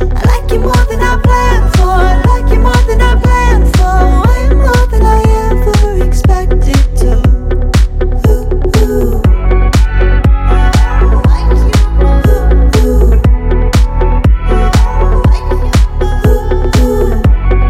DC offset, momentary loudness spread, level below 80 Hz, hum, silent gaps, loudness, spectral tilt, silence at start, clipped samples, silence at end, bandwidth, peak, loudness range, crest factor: under 0.1%; 3 LU; -8 dBFS; none; none; -10 LUFS; -6.5 dB/octave; 0 s; under 0.1%; 0 s; 13.5 kHz; 0 dBFS; 2 LU; 6 dB